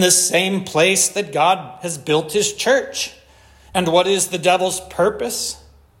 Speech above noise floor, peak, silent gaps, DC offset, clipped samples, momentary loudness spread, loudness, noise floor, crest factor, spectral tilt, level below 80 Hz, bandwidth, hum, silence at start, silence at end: 30 dB; 0 dBFS; none; under 0.1%; under 0.1%; 11 LU; -18 LUFS; -48 dBFS; 18 dB; -2.5 dB/octave; -52 dBFS; 16.5 kHz; none; 0 s; 0.45 s